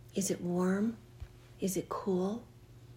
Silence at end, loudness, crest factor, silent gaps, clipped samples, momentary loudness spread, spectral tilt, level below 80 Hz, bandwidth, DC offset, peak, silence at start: 0 s; -35 LUFS; 14 dB; none; under 0.1%; 19 LU; -5.5 dB/octave; -60 dBFS; 16 kHz; under 0.1%; -22 dBFS; 0.05 s